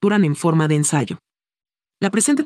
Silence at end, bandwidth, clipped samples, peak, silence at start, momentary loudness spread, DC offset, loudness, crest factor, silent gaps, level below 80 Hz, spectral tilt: 0 s; 12.5 kHz; under 0.1%; -4 dBFS; 0 s; 10 LU; under 0.1%; -19 LUFS; 16 dB; none; -68 dBFS; -5 dB/octave